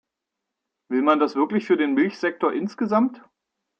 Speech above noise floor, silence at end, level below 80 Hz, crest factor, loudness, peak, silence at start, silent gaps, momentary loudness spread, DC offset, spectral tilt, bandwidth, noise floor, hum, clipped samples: 62 dB; 0.6 s; -76 dBFS; 18 dB; -22 LUFS; -4 dBFS; 0.9 s; none; 6 LU; under 0.1%; -7 dB/octave; 7.2 kHz; -84 dBFS; none; under 0.1%